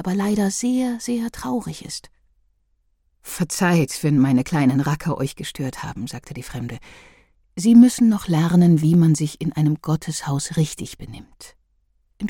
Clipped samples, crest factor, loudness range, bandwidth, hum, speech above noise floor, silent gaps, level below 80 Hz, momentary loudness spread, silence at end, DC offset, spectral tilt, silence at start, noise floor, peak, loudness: under 0.1%; 18 dB; 8 LU; 17.5 kHz; none; 46 dB; none; -50 dBFS; 18 LU; 0 s; under 0.1%; -6 dB/octave; 0 s; -65 dBFS; -2 dBFS; -19 LUFS